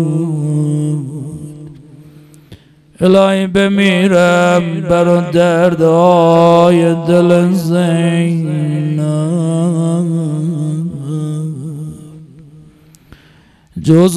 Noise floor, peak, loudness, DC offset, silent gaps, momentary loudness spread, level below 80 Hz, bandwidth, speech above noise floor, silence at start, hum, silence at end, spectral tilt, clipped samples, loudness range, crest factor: -46 dBFS; 0 dBFS; -12 LUFS; under 0.1%; none; 15 LU; -48 dBFS; 13 kHz; 36 dB; 0 s; none; 0 s; -7 dB/octave; 0.5%; 10 LU; 12 dB